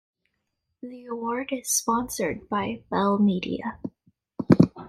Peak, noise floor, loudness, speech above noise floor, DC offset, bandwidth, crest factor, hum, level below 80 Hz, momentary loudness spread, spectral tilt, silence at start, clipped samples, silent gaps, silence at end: -2 dBFS; -78 dBFS; -25 LUFS; 52 dB; under 0.1%; 15.5 kHz; 24 dB; none; -56 dBFS; 19 LU; -5 dB/octave; 0.85 s; under 0.1%; none; 0 s